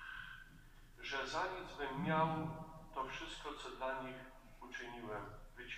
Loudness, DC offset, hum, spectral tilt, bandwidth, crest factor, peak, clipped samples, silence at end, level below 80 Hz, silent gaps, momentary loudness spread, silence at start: -43 LUFS; under 0.1%; none; -5 dB/octave; 15.5 kHz; 22 dB; -22 dBFS; under 0.1%; 0 s; -60 dBFS; none; 18 LU; 0 s